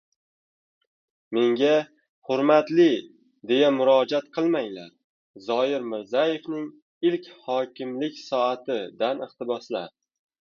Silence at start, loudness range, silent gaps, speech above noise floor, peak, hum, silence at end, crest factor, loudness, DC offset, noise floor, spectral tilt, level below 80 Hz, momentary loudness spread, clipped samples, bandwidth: 1.3 s; 6 LU; 2.09-2.22 s, 5.04-5.34 s, 6.82-7.01 s; over 66 dB; -6 dBFS; none; 0.65 s; 20 dB; -24 LUFS; under 0.1%; under -90 dBFS; -6 dB/octave; -76 dBFS; 14 LU; under 0.1%; 7 kHz